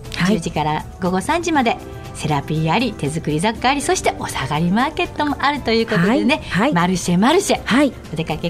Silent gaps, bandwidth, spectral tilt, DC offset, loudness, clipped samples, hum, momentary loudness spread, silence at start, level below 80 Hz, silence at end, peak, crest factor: none; 15.5 kHz; -5 dB/octave; under 0.1%; -18 LUFS; under 0.1%; none; 6 LU; 0 s; -38 dBFS; 0 s; -4 dBFS; 16 dB